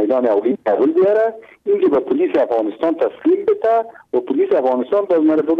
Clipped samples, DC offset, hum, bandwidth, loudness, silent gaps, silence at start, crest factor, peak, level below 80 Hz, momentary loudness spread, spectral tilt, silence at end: under 0.1%; under 0.1%; none; 4.9 kHz; -17 LUFS; none; 0 s; 10 dB; -6 dBFS; -62 dBFS; 5 LU; -8 dB/octave; 0 s